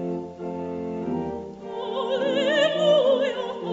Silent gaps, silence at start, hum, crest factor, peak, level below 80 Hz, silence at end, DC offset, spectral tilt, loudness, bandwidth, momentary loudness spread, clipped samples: none; 0 s; none; 16 dB; -8 dBFS; -60 dBFS; 0 s; under 0.1%; -5 dB/octave; -24 LUFS; 8 kHz; 14 LU; under 0.1%